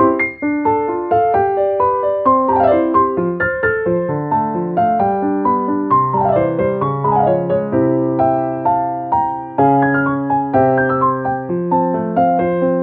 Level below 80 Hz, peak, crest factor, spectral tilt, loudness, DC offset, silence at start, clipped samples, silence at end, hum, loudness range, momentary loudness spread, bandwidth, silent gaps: -46 dBFS; -2 dBFS; 14 dB; -12 dB/octave; -16 LUFS; under 0.1%; 0 s; under 0.1%; 0 s; none; 1 LU; 5 LU; 4.5 kHz; none